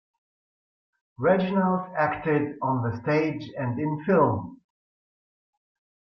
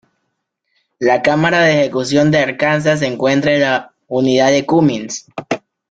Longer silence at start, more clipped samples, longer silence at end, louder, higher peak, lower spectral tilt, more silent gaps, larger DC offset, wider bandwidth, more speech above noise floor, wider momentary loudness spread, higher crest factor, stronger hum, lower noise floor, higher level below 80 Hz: first, 1.2 s vs 1 s; neither; first, 1.6 s vs 0.3 s; second, -25 LUFS vs -14 LUFS; second, -8 dBFS vs -2 dBFS; first, -9.5 dB/octave vs -5 dB/octave; neither; neither; second, 6.2 kHz vs 9.2 kHz; first, over 65 dB vs 58 dB; second, 8 LU vs 12 LU; about the same, 18 dB vs 14 dB; neither; first, under -90 dBFS vs -72 dBFS; second, -62 dBFS vs -54 dBFS